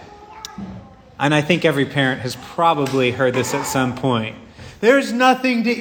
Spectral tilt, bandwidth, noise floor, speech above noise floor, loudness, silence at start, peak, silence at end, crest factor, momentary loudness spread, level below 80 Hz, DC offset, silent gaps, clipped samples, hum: -5 dB/octave; over 20 kHz; -37 dBFS; 20 dB; -18 LUFS; 0 s; 0 dBFS; 0 s; 18 dB; 17 LU; -52 dBFS; under 0.1%; none; under 0.1%; none